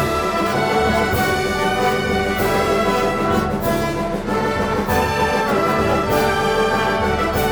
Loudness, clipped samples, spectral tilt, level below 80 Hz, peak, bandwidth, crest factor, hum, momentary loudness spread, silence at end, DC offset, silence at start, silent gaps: -18 LUFS; under 0.1%; -5 dB/octave; -34 dBFS; -4 dBFS; over 20 kHz; 14 dB; none; 3 LU; 0 s; under 0.1%; 0 s; none